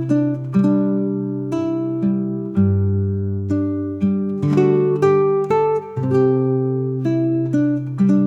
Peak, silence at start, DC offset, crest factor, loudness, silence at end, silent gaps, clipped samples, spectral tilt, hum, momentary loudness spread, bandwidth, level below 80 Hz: -4 dBFS; 0 s; under 0.1%; 14 dB; -19 LUFS; 0 s; none; under 0.1%; -10 dB/octave; none; 6 LU; 7.6 kHz; -58 dBFS